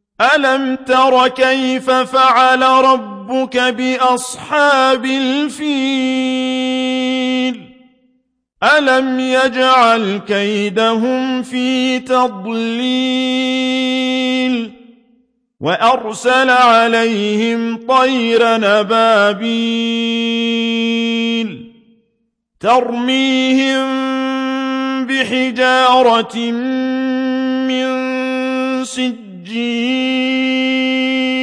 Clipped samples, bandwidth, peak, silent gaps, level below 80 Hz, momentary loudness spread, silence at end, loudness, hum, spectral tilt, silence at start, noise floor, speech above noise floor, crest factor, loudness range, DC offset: under 0.1%; 11 kHz; 0 dBFS; none; -62 dBFS; 8 LU; 0 s; -14 LUFS; none; -3.5 dB/octave; 0.2 s; -66 dBFS; 53 dB; 14 dB; 5 LU; under 0.1%